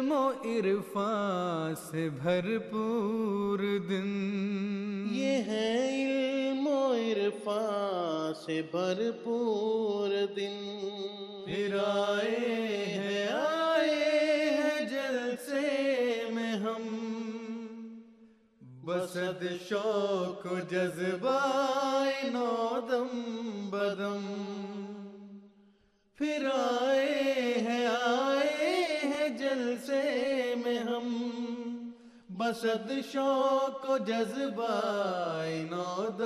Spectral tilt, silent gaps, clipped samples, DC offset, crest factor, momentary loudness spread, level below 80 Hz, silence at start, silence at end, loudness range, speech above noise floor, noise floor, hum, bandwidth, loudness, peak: -5 dB/octave; none; under 0.1%; under 0.1%; 14 dB; 9 LU; -78 dBFS; 0 s; 0 s; 6 LU; 35 dB; -66 dBFS; none; 13 kHz; -31 LUFS; -16 dBFS